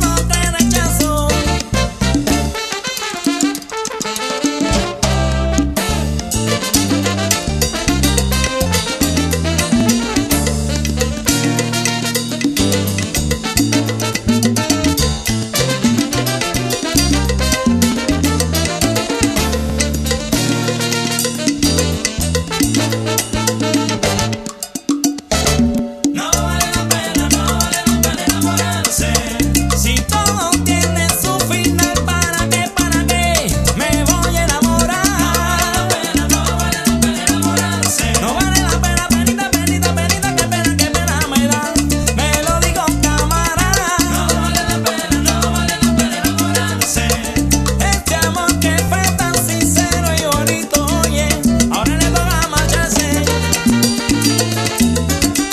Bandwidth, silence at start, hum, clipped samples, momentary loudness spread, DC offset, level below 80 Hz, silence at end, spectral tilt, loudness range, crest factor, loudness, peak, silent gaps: 14.5 kHz; 0 s; none; under 0.1%; 4 LU; under 0.1%; -24 dBFS; 0 s; -3.5 dB/octave; 2 LU; 16 dB; -15 LUFS; 0 dBFS; none